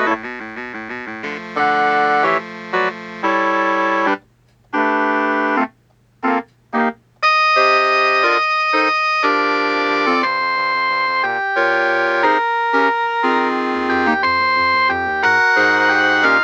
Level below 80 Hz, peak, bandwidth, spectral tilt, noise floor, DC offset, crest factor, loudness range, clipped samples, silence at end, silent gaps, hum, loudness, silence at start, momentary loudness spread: -58 dBFS; -2 dBFS; 8.4 kHz; -3.5 dB/octave; -55 dBFS; under 0.1%; 14 dB; 4 LU; under 0.1%; 0 s; none; none; -16 LUFS; 0 s; 10 LU